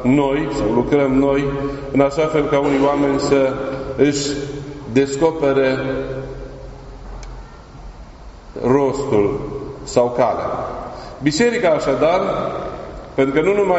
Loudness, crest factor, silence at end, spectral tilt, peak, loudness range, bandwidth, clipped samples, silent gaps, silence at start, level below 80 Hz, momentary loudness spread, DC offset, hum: -18 LUFS; 18 dB; 0 s; -5.5 dB/octave; 0 dBFS; 6 LU; 8 kHz; under 0.1%; none; 0 s; -38 dBFS; 17 LU; under 0.1%; none